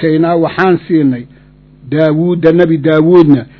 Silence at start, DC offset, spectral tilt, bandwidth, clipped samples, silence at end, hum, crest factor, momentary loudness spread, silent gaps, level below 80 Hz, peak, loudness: 0 s; under 0.1%; -10 dB/octave; 6 kHz; 1%; 0.15 s; 50 Hz at -35 dBFS; 10 dB; 7 LU; none; -46 dBFS; 0 dBFS; -10 LUFS